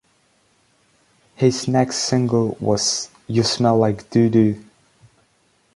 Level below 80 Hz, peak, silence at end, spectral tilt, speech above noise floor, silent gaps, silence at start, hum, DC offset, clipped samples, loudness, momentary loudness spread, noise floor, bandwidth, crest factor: -54 dBFS; -2 dBFS; 1.15 s; -5 dB/octave; 44 dB; none; 1.4 s; none; under 0.1%; under 0.1%; -19 LUFS; 4 LU; -62 dBFS; 11.5 kHz; 18 dB